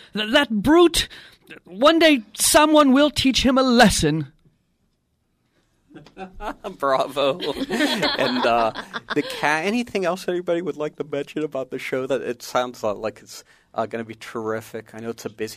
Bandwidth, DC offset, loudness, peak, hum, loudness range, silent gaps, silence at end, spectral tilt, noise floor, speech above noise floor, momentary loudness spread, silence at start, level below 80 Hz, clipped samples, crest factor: 15.5 kHz; under 0.1%; -20 LUFS; -4 dBFS; none; 11 LU; none; 0 s; -3.5 dB/octave; -69 dBFS; 48 dB; 18 LU; 0.15 s; -44 dBFS; under 0.1%; 18 dB